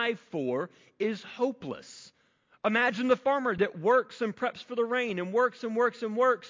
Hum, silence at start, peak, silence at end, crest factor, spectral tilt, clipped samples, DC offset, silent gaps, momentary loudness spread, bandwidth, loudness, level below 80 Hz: none; 0 s; -12 dBFS; 0 s; 16 dB; -5.5 dB/octave; under 0.1%; under 0.1%; none; 10 LU; 7.6 kHz; -29 LUFS; -72 dBFS